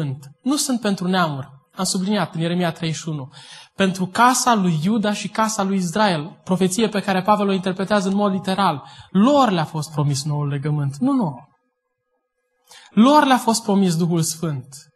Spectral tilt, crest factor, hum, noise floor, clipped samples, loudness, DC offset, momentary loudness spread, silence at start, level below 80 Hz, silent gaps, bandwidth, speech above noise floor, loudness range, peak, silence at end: -5 dB/octave; 18 dB; none; -73 dBFS; under 0.1%; -19 LUFS; under 0.1%; 12 LU; 0 s; -62 dBFS; none; 12.5 kHz; 54 dB; 4 LU; -2 dBFS; 0.15 s